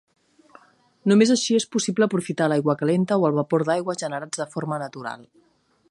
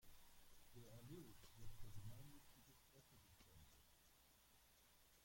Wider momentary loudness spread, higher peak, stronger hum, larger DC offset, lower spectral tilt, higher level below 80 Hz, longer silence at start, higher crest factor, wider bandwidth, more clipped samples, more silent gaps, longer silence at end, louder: about the same, 11 LU vs 9 LU; first, -6 dBFS vs -42 dBFS; neither; neither; about the same, -5 dB/octave vs -4.5 dB/octave; about the same, -72 dBFS vs -70 dBFS; first, 1.05 s vs 0 s; about the same, 18 dB vs 18 dB; second, 11.5 kHz vs 16.5 kHz; neither; neither; first, 0.75 s vs 0 s; first, -22 LUFS vs -65 LUFS